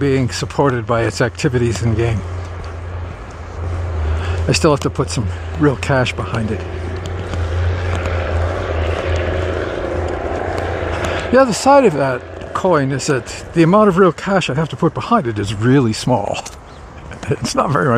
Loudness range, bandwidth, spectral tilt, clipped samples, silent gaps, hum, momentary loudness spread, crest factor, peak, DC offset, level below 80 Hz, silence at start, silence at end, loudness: 6 LU; 13 kHz; -6 dB/octave; under 0.1%; none; none; 13 LU; 16 dB; 0 dBFS; under 0.1%; -30 dBFS; 0 s; 0 s; -17 LUFS